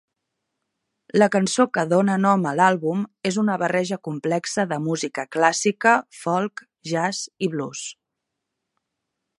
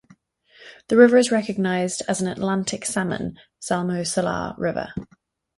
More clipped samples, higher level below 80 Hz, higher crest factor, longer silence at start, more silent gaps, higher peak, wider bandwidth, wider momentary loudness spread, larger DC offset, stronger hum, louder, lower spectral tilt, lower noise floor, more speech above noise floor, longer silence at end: neither; second, -72 dBFS vs -54 dBFS; about the same, 22 dB vs 20 dB; first, 1.15 s vs 0.6 s; neither; about the same, -2 dBFS vs -2 dBFS; about the same, 11.5 kHz vs 11.5 kHz; second, 9 LU vs 15 LU; neither; neither; about the same, -22 LUFS vs -21 LUFS; about the same, -4.5 dB/octave vs -5 dB/octave; first, -81 dBFS vs -56 dBFS; first, 60 dB vs 34 dB; first, 1.45 s vs 0.55 s